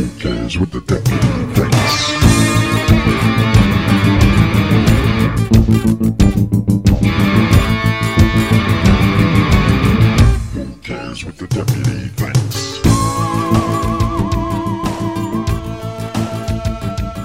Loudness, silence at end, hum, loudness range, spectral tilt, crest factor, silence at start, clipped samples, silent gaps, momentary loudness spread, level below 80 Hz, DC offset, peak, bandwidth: -14 LUFS; 0 s; none; 6 LU; -6 dB/octave; 14 dB; 0 s; under 0.1%; none; 10 LU; -22 dBFS; 0.4%; 0 dBFS; 16 kHz